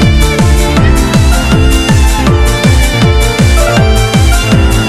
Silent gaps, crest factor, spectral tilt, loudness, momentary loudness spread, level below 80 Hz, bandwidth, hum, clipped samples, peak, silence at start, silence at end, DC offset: none; 6 dB; -5 dB/octave; -8 LUFS; 1 LU; -10 dBFS; 14 kHz; none; 3%; 0 dBFS; 0 s; 0 s; under 0.1%